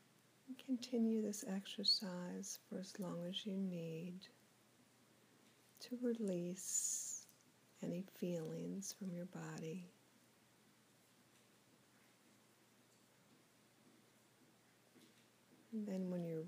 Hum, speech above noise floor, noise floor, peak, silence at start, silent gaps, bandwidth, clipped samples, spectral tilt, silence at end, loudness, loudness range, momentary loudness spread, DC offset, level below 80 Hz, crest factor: none; 28 dB; -72 dBFS; -26 dBFS; 0.45 s; none; 15.5 kHz; under 0.1%; -4 dB/octave; 0 s; -44 LUFS; 12 LU; 13 LU; under 0.1%; under -90 dBFS; 22 dB